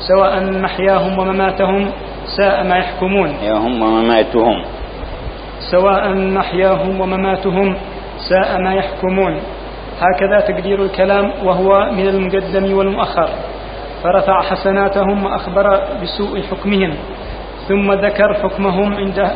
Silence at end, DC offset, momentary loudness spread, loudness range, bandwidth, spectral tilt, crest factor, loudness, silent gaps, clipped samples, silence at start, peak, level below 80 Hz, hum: 0 s; under 0.1%; 14 LU; 2 LU; 5.2 kHz; -10 dB/octave; 14 dB; -15 LUFS; none; under 0.1%; 0 s; 0 dBFS; -32 dBFS; none